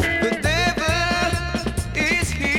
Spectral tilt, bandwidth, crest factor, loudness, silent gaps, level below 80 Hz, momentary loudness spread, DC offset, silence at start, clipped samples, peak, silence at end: -4 dB/octave; 17.5 kHz; 14 dB; -21 LUFS; none; -32 dBFS; 5 LU; under 0.1%; 0 s; under 0.1%; -6 dBFS; 0 s